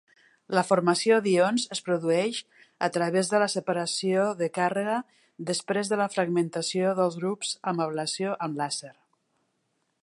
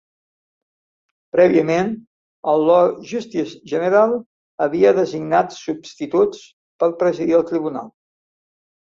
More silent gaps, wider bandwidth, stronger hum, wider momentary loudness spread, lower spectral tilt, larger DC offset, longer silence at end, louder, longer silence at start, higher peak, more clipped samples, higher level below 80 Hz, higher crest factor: second, none vs 2.07-2.43 s, 4.26-4.58 s, 6.53-6.79 s; first, 11.5 kHz vs 7.4 kHz; neither; second, 8 LU vs 13 LU; second, -4.5 dB/octave vs -6.5 dB/octave; neither; about the same, 1.1 s vs 1 s; second, -27 LUFS vs -18 LUFS; second, 0.5 s vs 1.35 s; second, -8 dBFS vs -2 dBFS; neither; second, -78 dBFS vs -62 dBFS; about the same, 20 dB vs 18 dB